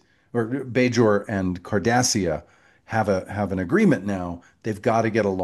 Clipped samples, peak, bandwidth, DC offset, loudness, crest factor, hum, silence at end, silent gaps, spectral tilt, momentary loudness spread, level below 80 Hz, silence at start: under 0.1%; -6 dBFS; 12.5 kHz; under 0.1%; -23 LUFS; 16 dB; none; 0 s; none; -5 dB/octave; 10 LU; -54 dBFS; 0.35 s